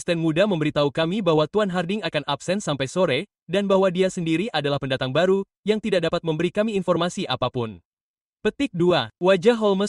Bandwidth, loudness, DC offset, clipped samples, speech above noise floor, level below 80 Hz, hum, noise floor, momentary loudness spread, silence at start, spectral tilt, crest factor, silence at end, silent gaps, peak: 11.5 kHz; -22 LUFS; under 0.1%; under 0.1%; over 68 dB; -56 dBFS; none; under -90 dBFS; 6 LU; 0 s; -6 dB/octave; 16 dB; 0 s; 3.42-3.46 s, 5.57-5.63 s, 7.85-8.14 s, 8.21-8.37 s; -6 dBFS